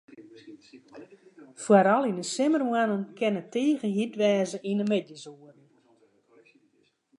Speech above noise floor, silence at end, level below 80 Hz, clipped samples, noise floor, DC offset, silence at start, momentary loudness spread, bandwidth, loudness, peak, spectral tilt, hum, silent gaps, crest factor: 42 dB; 1.85 s; -82 dBFS; under 0.1%; -68 dBFS; under 0.1%; 0.2 s; 10 LU; 11 kHz; -26 LUFS; -6 dBFS; -5.5 dB/octave; none; none; 22 dB